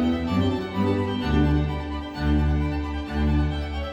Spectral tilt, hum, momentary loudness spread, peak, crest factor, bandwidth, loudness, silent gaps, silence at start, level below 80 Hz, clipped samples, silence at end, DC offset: -8 dB/octave; none; 7 LU; -10 dBFS; 14 dB; 8 kHz; -25 LUFS; none; 0 s; -28 dBFS; under 0.1%; 0 s; under 0.1%